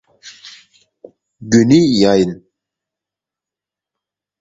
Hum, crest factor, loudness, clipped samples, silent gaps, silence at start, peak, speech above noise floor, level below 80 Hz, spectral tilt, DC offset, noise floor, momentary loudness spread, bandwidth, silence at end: none; 18 dB; -12 LUFS; under 0.1%; none; 0.25 s; 0 dBFS; 75 dB; -50 dBFS; -6 dB/octave; under 0.1%; -87 dBFS; 25 LU; 7.8 kHz; 2.05 s